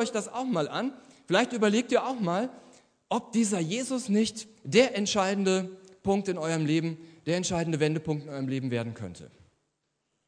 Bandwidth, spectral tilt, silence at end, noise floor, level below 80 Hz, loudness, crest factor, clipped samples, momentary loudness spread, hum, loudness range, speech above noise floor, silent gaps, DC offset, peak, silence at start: 10.5 kHz; -5 dB/octave; 1 s; -79 dBFS; -66 dBFS; -28 LUFS; 20 dB; under 0.1%; 11 LU; none; 3 LU; 51 dB; none; under 0.1%; -8 dBFS; 0 s